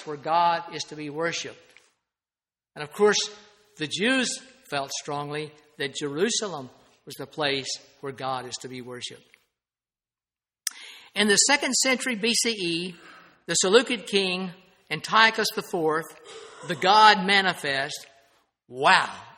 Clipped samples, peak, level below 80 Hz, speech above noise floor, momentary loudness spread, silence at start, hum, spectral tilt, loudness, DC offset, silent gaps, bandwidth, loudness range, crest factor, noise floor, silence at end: under 0.1%; 0 dBFS; -72 dBFS; over 65 dB; 19 LU; 0 s; none; -2 dB/octave; -24 LUFS; under 0.1%; none; 16 kHz; 11 LU; 26 dB; under -90 dBFS; 0.05 s